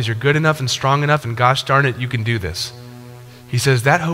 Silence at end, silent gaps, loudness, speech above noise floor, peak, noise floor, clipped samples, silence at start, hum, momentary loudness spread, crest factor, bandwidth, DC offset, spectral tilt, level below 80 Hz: 0 s; none; -17 LUFS; 21 dB; 0 dBFS; -38 dBFS; under 0.1%; 0 s; none; 11 LU; 18 dB; 16 kHz; under 0.1%; -5 dB/octave; -46 dBFS